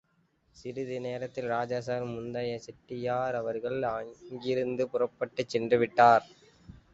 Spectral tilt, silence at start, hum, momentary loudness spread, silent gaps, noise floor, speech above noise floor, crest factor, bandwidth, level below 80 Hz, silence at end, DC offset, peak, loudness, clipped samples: -6 dB/octave; 0.6 s; none; 16 LU; none; -70 dBFS; 41 dB; 22 dB; 8 kHz; -66 dBFS; 0.2 s; under 0.1%; -8 dBFS; -30 LUFS; under 0.1%